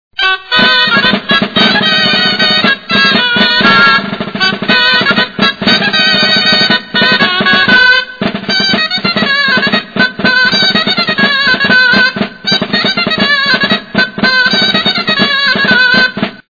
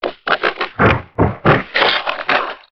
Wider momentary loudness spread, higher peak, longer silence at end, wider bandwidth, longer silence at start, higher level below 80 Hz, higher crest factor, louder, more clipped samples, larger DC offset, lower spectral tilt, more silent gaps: about the same, 6 LU vs 5 LU; about the same, 0 dBFS vs 0 dBFS; about the same, 0.15 s vs 0.15 s; second, 5.4 kHz vs 6.4 kHz; first, 0.2 s vs 0 s; second, -46 dBFS vs -36 dBFS; second, 10 dB vs 16 dB; first, -8 LUFS vs -16 LUFS; first, 0.8% vs under 0.1%; about the same, 0.3% vs 0.5%; second, -4 dB/octave vs -7 dB/octave; neither